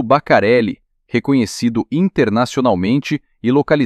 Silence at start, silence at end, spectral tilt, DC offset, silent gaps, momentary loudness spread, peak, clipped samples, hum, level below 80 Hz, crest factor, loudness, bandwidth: 0 s; 0 s; -6.5 dB/octave; under 0.1%; none; 9 LU; -2 dBFS; under 0.1%; none; -50 dBFS; 14 dB; -16 LUFS; 13 kHz